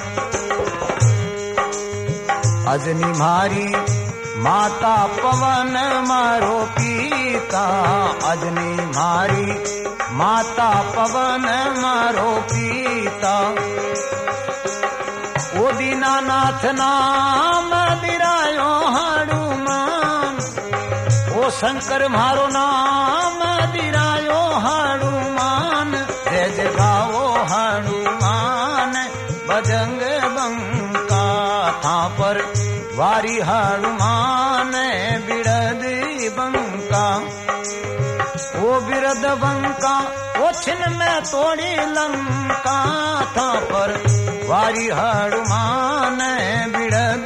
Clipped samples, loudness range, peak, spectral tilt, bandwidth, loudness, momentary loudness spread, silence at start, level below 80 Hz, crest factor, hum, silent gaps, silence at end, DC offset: under 0.1%; 3 LU; -4 dBFS; -4.5 dB/octave; 13 kHz; -19 LUFS; 6 LU; 0 s; -48 dBFS; 16 dB; none; none; 0 s; under 0.1%